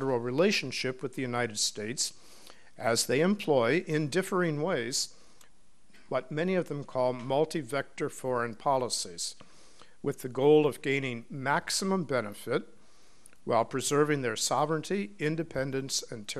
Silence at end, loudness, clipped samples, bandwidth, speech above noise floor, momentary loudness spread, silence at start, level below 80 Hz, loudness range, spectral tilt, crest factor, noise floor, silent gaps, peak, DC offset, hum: 0 s; -30 LUFS; under 0.1%; 13.5 kHz; 34 dB; 9 LU; 0 s; -68 dBFS; 3 LU; -4 dB/octave; 18 dB; -64 dBFS; none; -12 dBFS; 0.4%; none